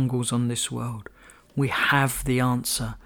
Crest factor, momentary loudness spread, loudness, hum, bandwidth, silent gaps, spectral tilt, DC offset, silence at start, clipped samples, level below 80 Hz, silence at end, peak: 18 dB; 12 LU; -24 LUFS; none; over 20 kHz; none; -4.5 dB/octave; under 0.1%; 0 s; under 0.1%; -46 dBFS; 0.1 s; -6 dBFS